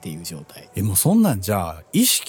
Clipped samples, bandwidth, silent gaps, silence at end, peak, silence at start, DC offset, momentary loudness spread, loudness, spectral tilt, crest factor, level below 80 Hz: under 0.1%; 19.5 kHz; none; 0 s; -6 dBFS; 0.05 s; under 0.1%; 17 LU; -19 LUFS; -4 dB/octave; 14 dB; -50 dBFS